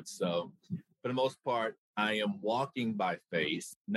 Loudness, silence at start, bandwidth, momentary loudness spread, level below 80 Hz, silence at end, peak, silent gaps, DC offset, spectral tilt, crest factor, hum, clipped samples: -34 LUFS; 0 s; 12.5 kHz; 7 LU; -80 dBFS; 0 s; -18 dBFS; 1.78-1.94 s, 3.76-3.85 s; under 0.1%; -5 dB/octave; 18 dB; none; under 0.1%